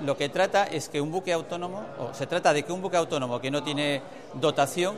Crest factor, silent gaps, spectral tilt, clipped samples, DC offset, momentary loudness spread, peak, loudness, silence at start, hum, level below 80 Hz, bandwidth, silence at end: 18 dB; none; -4.5 dB/octave; under 0.1%; 0.3%; 10 LU; -8 dBFS; -27 LUFS; 0 s; none; -70 dBFS; 14 kHz; 0 s